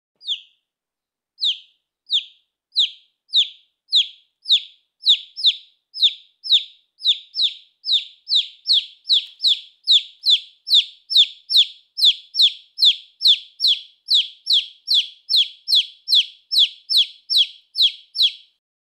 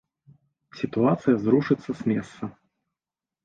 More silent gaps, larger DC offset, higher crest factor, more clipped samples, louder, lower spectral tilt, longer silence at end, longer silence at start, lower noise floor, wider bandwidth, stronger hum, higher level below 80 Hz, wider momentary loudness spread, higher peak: neither; neither; about the same, 18 dB vs 18 dB; neither; first, -17 LUFS vs -24 LUFS; second, 8.5 dB/octave vs -8.5 dB/octave; second, 0.55 s vs 0.95 s; second, 0.25 s vs 0.75 s; about the same, -87 dBFS vs under -90 dBFS; first, 14.5 kHz vs 7.8 kHz; neither; second, under -90 dBFS vs -62 dBFS; second, 7 LU vs 16 LU; first, -4 dBFS vs -8 dBFS